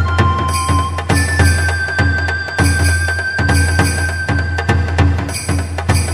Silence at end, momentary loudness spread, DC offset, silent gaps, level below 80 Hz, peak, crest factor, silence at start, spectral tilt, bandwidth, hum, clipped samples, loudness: 0 s; 5 LU; under 0.1%; none; -24 dBFS; 0 dBFS; 14 dB; 0 s; -4.5 dB/octave; 15 kHz; none; under 0.1%; -15 LUFS